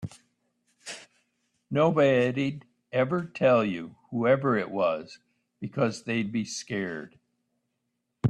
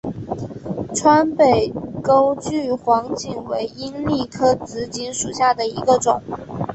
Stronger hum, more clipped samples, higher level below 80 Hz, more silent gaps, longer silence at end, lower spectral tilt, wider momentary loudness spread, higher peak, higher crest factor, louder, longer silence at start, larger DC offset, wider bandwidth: neither; neither; second, -68 dBFS vs -48 dBFS; neither; about the same, 0 s vs 0 s; first, -6 dB/octave vs -4.5 dB/octave; first, 19 LU vs 13 LU; second, -10 dBFS vs -2 dBFS; about the same, 18 dB vs 18 dB; second, -27 LUFS vs -19 LUFS; about the same, 0 s vs 0.05 s; neither; first, 11 kHz vs 8.6 kHz